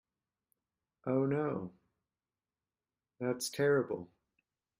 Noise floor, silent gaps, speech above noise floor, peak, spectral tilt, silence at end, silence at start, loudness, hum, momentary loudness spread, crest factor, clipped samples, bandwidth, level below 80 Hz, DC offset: under -90 dBFS; none; over 57 dB; -20 dBFS; -5.5 dB/octave; 0.75 s; 1.05 s; -35 LUFS; none; 14 LU; 18 dB; under 0.1%; 16 kHz; -78 dBFS; under 0.1%